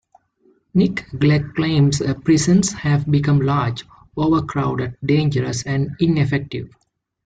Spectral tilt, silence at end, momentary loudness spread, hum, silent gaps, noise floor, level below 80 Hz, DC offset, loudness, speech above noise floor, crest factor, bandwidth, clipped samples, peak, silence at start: -6 dB/octave; 0.6 s; 7 LU; none; none; -59 dBFS; -46 dBFS; under 0.1%; -19 LUFS; 41 dB; 14 dB; 9.4 kHz; under 0.1%; -4 dBFS; 0.75 s